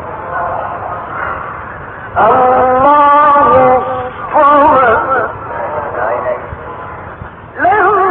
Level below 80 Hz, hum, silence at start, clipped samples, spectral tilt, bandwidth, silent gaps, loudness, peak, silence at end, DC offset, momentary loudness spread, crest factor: -38 dBFS; none; 0 s; under 0.1%; -9.5 dB/octave; 4.1 kHz; none; -10 LUFS; 0 dBFS; 0 s; under 0.1%; 19 LU; 12 dB